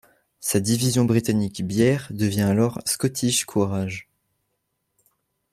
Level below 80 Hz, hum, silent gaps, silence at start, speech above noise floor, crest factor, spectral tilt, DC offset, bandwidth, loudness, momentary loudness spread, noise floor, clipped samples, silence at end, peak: -56 dBFS; none; none; 0.4 s; 54 dB; 18 dB; -5 dB/octave; under 0.1%; 15.5 kHz; -22 LUFS; 6 LU; -75 dBFS; under 0.1%; 1.5 s; -6 dBFS